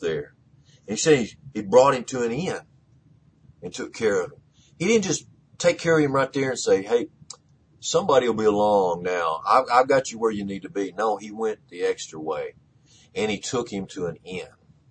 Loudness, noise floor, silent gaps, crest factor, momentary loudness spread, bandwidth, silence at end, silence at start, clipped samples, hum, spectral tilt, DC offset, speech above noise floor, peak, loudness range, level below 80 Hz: -23 LUFS; -57 dBFS; none; 20 dB; 16 LU; 9.6 kHz; 0.45 s; 0 s; under 0.1%; none; -4.5 dB/octave; under 0.1%; 34 dB; -4 dBFS; 7 LU; -60 dBFS